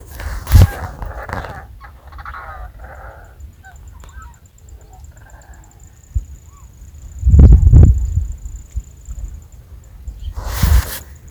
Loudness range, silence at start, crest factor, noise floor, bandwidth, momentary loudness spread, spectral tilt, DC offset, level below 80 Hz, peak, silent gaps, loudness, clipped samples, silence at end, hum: 22 LU; 0.1 s; 16 dB; -42 dBFS; over 20 kHz; 28 LU; -6.5 dB/octave; under 0.1%; -18 dBFS; 0 dBFS; none; -14 LUFS; 0.3%; 0.3 s; none